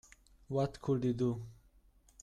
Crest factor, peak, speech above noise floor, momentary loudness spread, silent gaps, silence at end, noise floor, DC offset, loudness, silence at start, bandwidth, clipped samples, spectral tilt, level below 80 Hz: 16 dB; -22 dBFS; 32 dB; 10 LU; none; 0.7 s; -66 dBFS; under 0.1%; -36 LUFS; 0.5 s; 11 kHz; under 0.1%; -8 dB/octave; -62 dBFS